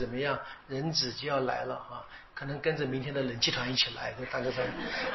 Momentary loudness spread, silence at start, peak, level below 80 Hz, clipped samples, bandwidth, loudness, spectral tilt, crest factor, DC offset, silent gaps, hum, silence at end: 11 LU; 0 s; -14 dBFS; -58 dBFS; under 0.1%; 6.2 kHz; -32 LUFS; -2.5 dB/octave; 20 dB; under 0.1%; none; none; 0 s